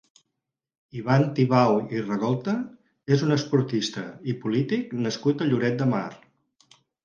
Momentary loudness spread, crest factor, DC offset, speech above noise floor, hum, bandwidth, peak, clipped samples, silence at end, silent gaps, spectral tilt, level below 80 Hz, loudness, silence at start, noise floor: 12 LU; 18 dB; under 0.1%; 60 dB; none; 7.4 kHz; -6 dBFS; under 0.1%; 0.9 s; none; -7 dB/octave; -66 dBFS; -25 LUFS; 0.95 s; -84 dBFS